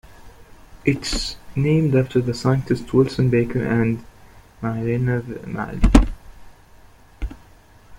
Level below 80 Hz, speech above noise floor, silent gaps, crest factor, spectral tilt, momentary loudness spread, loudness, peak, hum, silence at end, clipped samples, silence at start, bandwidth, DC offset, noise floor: -28 dBFS; 29 dB; none; 20 dB; -6.5 dB/octave; 13 LU; -21 LUFS; -2 dBFS; none; 0.05 s; under 0.1%; 0.1 s; 12.5 kHz; under 0.1%; -48 dBFS